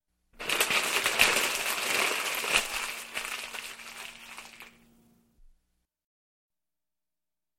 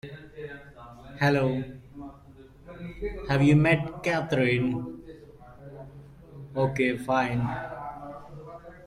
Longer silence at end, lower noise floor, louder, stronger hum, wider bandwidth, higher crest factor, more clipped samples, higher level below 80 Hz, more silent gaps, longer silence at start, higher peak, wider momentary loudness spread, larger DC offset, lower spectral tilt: first, 2.9 s vs 0 s; first, under -90 dBFS vs -51 dBFS; about the same, -27 LUFS vs -26 LUFS; neither; first, 16.5 kHz vs 12 kHz; first, 30 dB vs 18 dB; neither; second, -60 dBFS vs -50 dBFS; neither; first, 0.4 s vs 0.05 s; first, -4 dBFS vs -10 dBFS; second, 19 LU vs 23 LU; neither; second, 0.5 dB/octave vs -7.5 dB/octave